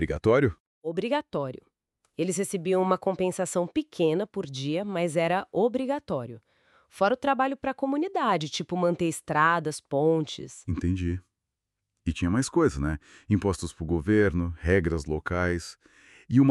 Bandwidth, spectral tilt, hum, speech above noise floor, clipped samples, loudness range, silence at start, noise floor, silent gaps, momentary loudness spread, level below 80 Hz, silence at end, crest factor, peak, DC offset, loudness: 13 kHz; -6 dB/octave; none; 58 dB; under 0.1%; 3 LU; 0 s; -85 dBFS; 0.60-0.82 s; 10 LU; -46 dBFS; 0 s; 20 dB; -8 dBFS; under 0.1%; -27 LUFS